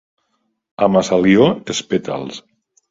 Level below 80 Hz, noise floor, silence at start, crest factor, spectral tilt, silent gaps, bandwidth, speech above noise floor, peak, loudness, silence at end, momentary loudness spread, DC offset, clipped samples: -52 dBFS; -69 dBFS; 0.8 s; 18 dB; -5.5 dB/octave; none; 7.8 kHz; 54 dB; 0 dBFS; -16 LUFS; 0.5 s; 15 LU; under 0.1%; under 0.1%